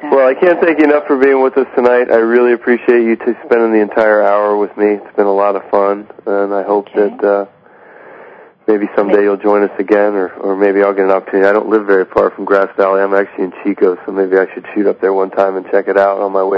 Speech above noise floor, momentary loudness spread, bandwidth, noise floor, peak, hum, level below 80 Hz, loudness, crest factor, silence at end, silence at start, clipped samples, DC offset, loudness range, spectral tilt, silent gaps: 28 dB; 6 LU; 5.4 kHz; -40 dBFS; 0 dBFS; none; -58 dBFS; -12 LUFS; 12 dB; 0 s; 0 s; 0.2%; under 0.1%; 4 LU; -8 dB/octave; none